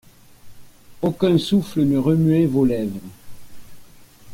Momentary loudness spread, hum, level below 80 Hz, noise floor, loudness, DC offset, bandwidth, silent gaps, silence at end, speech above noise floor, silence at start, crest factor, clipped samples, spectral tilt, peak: 9 LU; none; -50 dBFS; -45 dBFS; -19 LUFS; under 0.1%; 16.5 kHz; none; 0 s; 27 dB; 0.45 s; 14 dB; under 0.1%; -8 dB/octave; -6 dBFS